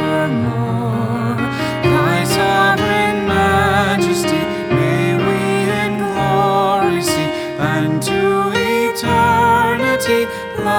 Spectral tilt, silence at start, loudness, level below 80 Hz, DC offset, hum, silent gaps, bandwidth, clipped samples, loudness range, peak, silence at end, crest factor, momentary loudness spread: -5.5 dB/octave; 0 s; -15 LUFS; -42 dBFS; under 0.1%; none; none; over 20 kHz; under 0.1%; 1 LU; -2 dBFS; 0 s; 14 dB; 6 LU